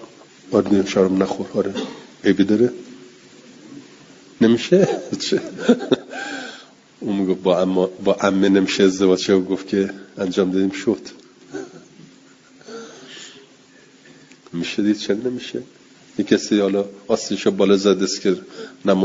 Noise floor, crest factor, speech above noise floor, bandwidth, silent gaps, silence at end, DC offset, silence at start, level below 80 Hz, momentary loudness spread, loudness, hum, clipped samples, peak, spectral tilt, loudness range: -49 dBFS; 20 dB; 31 dB; 7.8 kHz; none; 0 s; under 0.1%; 0 s; -62 dBFS; 21 LU; -19 LUFS; none; under 0.1%; 0 dBFS; -5.5 dB/octave; 10 LU